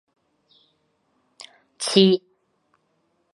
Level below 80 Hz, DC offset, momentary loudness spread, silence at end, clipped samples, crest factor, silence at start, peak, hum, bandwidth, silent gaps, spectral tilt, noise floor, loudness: -78 dBFS; under 0.1%; 28 LU; 1.15 s; under 0.1%; 24 dB; 1.8 s; -2 dBFS; none; 11.5 kHz; none; -5 dB/octave; -69 dBFS; -19 LUFS